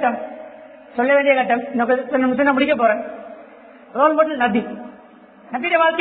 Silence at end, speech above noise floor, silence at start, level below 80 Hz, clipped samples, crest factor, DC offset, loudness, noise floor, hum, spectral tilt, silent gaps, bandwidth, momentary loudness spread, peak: 0 s; 28 dB; 0 s; -62 dBFS; under 0.1%; 18 dB; under 0.1%; -18 LUFS; -45 dBFS; none; -9 dB/octave; none; 4.5 kHz; 19 LU; -2 dBFS